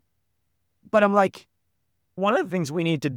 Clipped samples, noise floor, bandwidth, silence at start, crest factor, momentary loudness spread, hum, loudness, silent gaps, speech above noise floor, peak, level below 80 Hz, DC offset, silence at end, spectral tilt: under 0.1%; -76 dBFS; 17 kHz; 0.95 s; 20 dB; 7 LU; none; -23 LUFS; none; 54 dB; -6 dBFS; -72 dBFS; under 0.1%; 0 s; -6.5 dB/octave